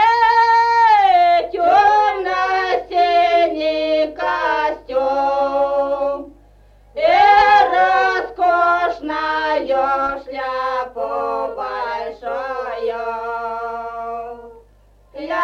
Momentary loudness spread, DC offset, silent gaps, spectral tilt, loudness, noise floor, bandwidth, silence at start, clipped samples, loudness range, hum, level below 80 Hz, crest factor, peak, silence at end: 13 LU; under 0.1%; none; -3.5 dB/octave; -17 LUFS; -51 dBFS; 7.4 kHz; 0 s; under 0.1%; 10 LU; 50 Hz at -50 dBFS; -48 dBFS; 14 dB; -2 dBFS; 0 s